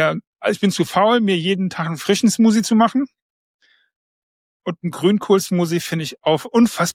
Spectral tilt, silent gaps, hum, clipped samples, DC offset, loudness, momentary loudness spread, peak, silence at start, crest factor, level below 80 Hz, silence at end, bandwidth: -5 dB/octave; 0.27-0.33 s, 3.22-3.59 s, 3.96-4.60 s; none; under 0.1%; under 0.1%; -18 LUFS; 9 LU; -4 dBFS; 0 s; 14 dB; -62 dBFS; 0 s; 16.5 kHz